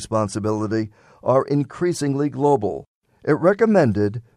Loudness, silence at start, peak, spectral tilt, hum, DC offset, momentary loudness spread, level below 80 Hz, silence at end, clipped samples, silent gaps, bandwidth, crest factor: -20 LUFS; 0 s; -2 dBFS; -7 dB/octave; none; under 0.1%; 11 LU; -56 dBFS; 0.15 s; under 0.1%; 2.88-3.01 s; 14 kHz; 18 dB